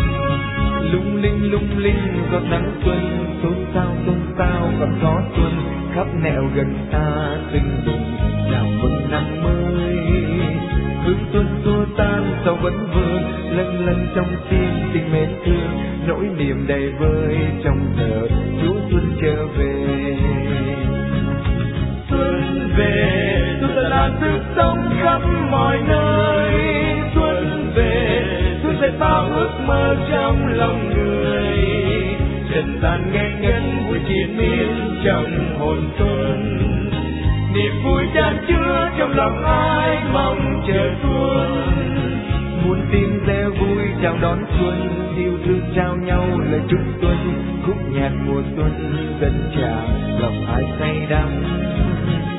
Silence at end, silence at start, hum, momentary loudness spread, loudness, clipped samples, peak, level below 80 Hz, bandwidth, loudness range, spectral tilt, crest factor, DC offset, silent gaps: 0 s; 0 s; none; 4 LU; -19 LUFS; under 0.1%; -2 dBFS; -26 dBFS; 4 kHz; 3 LU; -11 dB/octave; 16 dB; under 0.1%; none